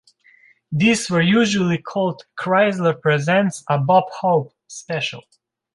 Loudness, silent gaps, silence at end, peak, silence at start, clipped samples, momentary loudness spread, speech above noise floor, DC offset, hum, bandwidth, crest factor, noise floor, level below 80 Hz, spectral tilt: -19 LUFS; none; 0.55 s; -4 dBFS; 0.7 s; under 0.1%; 11 LU; 35 dB; under 0.1%; none; 11.5 kHz; 16 dB; -54 dBFS; -60 dBFS; -5.5 dB/octave